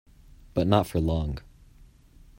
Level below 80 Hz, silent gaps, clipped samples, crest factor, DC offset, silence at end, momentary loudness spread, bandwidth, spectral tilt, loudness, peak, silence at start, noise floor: -42 dBFS; none; under 0.1%; 22 dB; under 0.1%; 1 s; 11 LU; 16 kHz; -7.5 dB/octave; -26 LUFS; -6 dBFS; 0.55 s; -54 dBFS